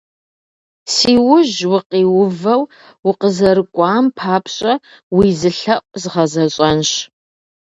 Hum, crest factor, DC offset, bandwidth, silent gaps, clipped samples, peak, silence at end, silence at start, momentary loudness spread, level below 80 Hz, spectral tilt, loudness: none; 14 dB; under 0.1%; 8.2 kHz; 1.86-1.90 s, 2.99-3.03 s, 5.03-5.11 s; under 0.1%; 0 dBFS; 0.65 s; 0.85 s; 9 LU; -48 dBFS; -5 dB/octave; -14 LUFS